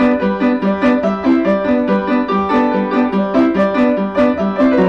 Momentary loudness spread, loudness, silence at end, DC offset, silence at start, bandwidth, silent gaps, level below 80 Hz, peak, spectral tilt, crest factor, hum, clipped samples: 2 LU; -14 LUFS; 0 s; 0.2%; 0 s; 6.4 kHz; none; -44 dBFS; -6 dBFS; -8.5 dB/octave; 8 dB; none; under 0.1%